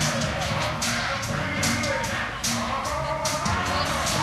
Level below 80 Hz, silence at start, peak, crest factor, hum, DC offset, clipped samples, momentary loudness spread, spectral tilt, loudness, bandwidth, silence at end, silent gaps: -40 dBFS; 0 s; -10 dBFS; 16 dB; none; under 0.1%; under 0.1%; 3 LU; -3 dB/octave; -25 LUFS; 15.5 kHz; 0 s; none